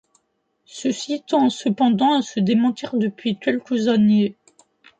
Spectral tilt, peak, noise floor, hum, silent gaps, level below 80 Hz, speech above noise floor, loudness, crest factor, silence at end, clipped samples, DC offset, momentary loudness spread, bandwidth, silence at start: -6 dB/octave; -6 dBFS; -70 dBFS; none; none; -66 dBFS; 51 dB; -20 LUFS; 14 dB; 0.65 s; under 0.1%; under 0.1%; 9 LU; 9 kHz; 0.75 s